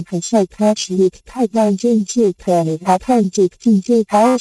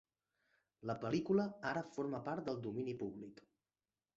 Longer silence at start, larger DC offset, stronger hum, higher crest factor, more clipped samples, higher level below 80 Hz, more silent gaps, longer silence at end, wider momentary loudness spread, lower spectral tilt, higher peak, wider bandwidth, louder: second, 0 s vs 0.8 s; neither; neither; second, 12 dB vs 18 dB; neither; first, -50 dBFS vs -76 dBFS; neither; second, 0 s vs 0.85 s; second, 4 LU vs 12 LU; about the same, -6 dB/octave vs -6 dB/octave; first, -2 dBFS vs -24 dBFS; first, 11 kHz vs 7.6 kHz; first, -16 LUFS vs -41 LUFS